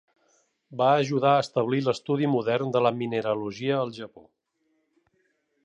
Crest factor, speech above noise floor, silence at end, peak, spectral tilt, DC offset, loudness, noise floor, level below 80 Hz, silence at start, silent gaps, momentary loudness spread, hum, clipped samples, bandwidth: 18 dB; 48 dB; 1.45 s; -8 dBFS; -6.5 dB/octave; under 0.1%; -25 LUFS; -73 dBFS; -72 dBFS; 0.7 s; none; 9 LU; none; under 0.1%; 10 kHz